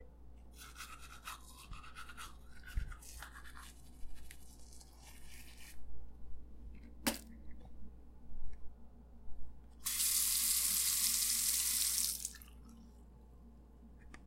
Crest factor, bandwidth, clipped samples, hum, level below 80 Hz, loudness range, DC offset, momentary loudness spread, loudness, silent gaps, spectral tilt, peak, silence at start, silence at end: 24 dB; 16 kHz; under 0.1%; none; -52 dBFS; 22 LU; under 0.1%; 27 LU; -33 LUFS; none; -0.5 dB/octave; -16 dBFS; 0 s; 0 s